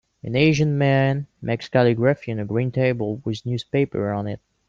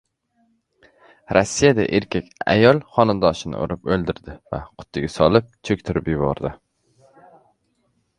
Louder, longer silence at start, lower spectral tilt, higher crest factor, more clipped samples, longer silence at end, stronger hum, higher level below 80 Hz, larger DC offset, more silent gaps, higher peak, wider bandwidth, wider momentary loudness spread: about the same, -22 LUFS vs -20 LUFS; second, 0.25 s vs 1.3 s; first, -7 dB/octave vs -5.5 dB/octave; second, 16 dB vs 22 dB; neither; second, 0.3 s vs 1.65 s; neither; second, -54 dBFS vs -44 dBFS; neither; neither; second, -4 dBFS vs 0 dBFS; second, 7.4 kHz vs 11 kHz; second, 10 LU vs 15 LU